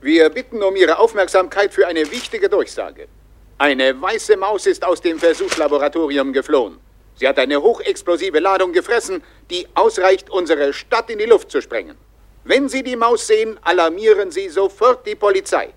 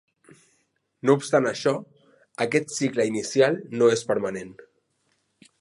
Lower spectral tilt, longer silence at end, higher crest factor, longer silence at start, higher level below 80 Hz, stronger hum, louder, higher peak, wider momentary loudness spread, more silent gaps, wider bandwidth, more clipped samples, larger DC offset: second, -2.5 dB/octave vs -5 dB/octave; second, 0.05 s vs 1.1 s; about the same, 16 dB vs 20 dB; second, 0.05 s vs 1.05 s; first, -50 dBFS vs -70 dBFS; neither; first, -17 LUFS vs -24 LUFS; first, 0 dBFS vs -4 dBFS; second, 7 LU vs 11 LU; neither; first, 13 kHz vs 11.5 kHz; neither; neither